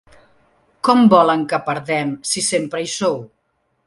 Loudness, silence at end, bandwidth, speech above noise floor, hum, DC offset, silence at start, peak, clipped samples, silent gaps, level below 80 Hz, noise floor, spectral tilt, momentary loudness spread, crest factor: -17 LUFS; 0.6 s; 11.5 kHz; 51 dB; none; under 0.1%; 0.85 s; 0 dBFS; under 0.1%; none; -60 dBFS; -67 dBFS; -4 dB/octave; 10 LU; 18 dB